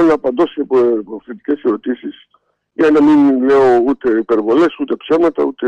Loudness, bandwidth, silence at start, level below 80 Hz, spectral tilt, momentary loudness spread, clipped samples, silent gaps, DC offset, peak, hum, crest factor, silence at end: -13 LUFS; 7.8 kHz; 0 s; -52 dBFS; -7 dB/octave; 13 LU; under 0.1%; none; under 0.1%; -4 dBFS; none; 10 dB; 0 s